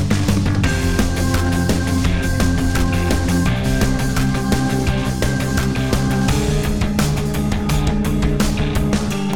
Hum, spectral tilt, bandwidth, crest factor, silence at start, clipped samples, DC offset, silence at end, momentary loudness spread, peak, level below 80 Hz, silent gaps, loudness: none; -5.5 dB/octave; 19 kHz; 14 dB; 0 s; under 0.1%; 3%; 0 s; 2 LU; -2 dBFS; -24 dBFS; none; -18 LUFS